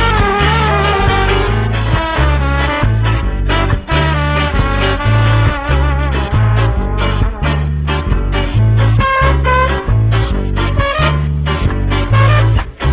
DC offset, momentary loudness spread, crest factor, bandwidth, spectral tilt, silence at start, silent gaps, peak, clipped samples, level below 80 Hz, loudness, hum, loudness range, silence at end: under 0.1%; 5 LU; 12 dB; 4 kHz; -10.5 dB/octave; 0 s; none; 0 dBFS; under 0.1%; -16 dBFS; -13 LUFS; none; 1 LU; 0 s